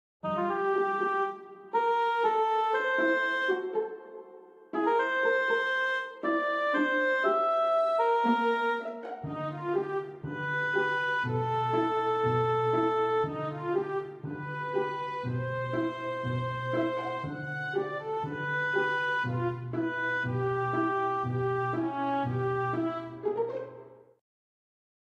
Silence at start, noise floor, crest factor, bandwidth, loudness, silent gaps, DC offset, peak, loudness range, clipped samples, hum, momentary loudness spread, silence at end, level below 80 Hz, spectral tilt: 0.25 s; -52 dBFS; 16 dB; 10.5 kHz; -29 LUFS; none; under 0.1%; -14 dBFS; 5 LU; under 0.1%; none; 9 LU; 1.1 s; -68 dBFS; -7 dB/octave